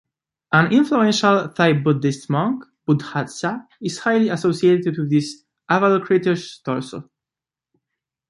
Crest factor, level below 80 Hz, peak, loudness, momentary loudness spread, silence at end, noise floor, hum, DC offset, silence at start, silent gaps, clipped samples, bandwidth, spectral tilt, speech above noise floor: 18 dB; -64 dBFS; -2 dBFS; -19 LUFS; 11 LU; 1.25 s; -89 dBFS; none; under 0.1%; 0.5 s; none; under 0.1%; 11.5 kHz; -6 dB/octave; 70 dB